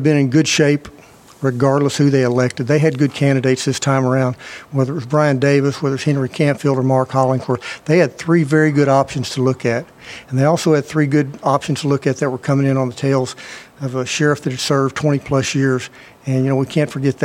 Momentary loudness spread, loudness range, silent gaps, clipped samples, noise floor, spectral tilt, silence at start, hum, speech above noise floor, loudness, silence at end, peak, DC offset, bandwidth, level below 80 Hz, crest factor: 8 LU; 3 LU; none; under 0.1%; -42 dBFS; -6 dB/octave; 0 s; none; 26 dB; -17 LUFS; 0 s; 0 dBFS; under 0.1%; 14.5 kHz; -54 dBFS; 16 dB